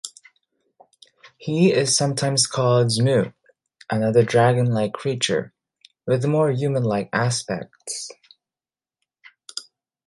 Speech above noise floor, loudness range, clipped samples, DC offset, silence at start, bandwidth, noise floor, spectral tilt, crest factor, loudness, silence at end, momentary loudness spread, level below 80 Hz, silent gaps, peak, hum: over 70 dB; 5 LU; under 0.1%; under 0.1%; 0.05 s; 11.5 kHz; under -90 dBFS; -4.5 dB/octave; 18 dB; -21 LUFS; 0.45 s; 17 LU; -62 dBFS; none; -4 dBFS; none